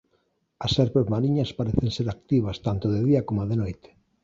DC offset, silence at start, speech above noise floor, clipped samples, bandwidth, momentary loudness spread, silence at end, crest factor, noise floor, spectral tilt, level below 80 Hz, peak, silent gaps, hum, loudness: under 0.1%; 0.6 s; 46 dB; under 0.1%; 7.6 kHz; 7 LU; 0.5 s; 20 dB; -70 dBFS; -8 dB/octave; -44 dBFS; -4 dBFS; none; none; -25 LUFS